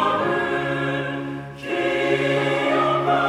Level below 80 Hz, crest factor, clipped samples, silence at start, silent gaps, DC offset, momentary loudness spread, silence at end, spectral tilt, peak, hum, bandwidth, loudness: -56 dBFS; 14 dB; under 0.1%; 0 s; none; under 0.1%; 8 LU; 0 s; -6 dB/octave; -8 dBFS; none; 13 kHz; -22 LUFS